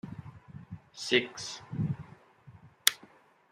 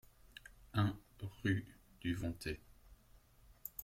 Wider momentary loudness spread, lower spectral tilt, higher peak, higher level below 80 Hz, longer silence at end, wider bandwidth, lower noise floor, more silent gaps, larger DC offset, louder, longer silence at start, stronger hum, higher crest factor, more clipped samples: about the same, 22 LU vs 20 LU; second, -3 dB/octave vs -6.5 dB/octave; first, -2 dBFS vs -22 dBFS; second, -66 dBFS vs -60 dBFS; first, 0.45 s vs 0 s; second, 14.5 kHz vs 16.5 kHz; second, -59 dBFS vs -66 dBFS; neither; neither; first, -31 LUFS vs -42 LUFS; second, 0.05 s vs 0.65 s; neither; first, 34 dB vs 22 dB; neither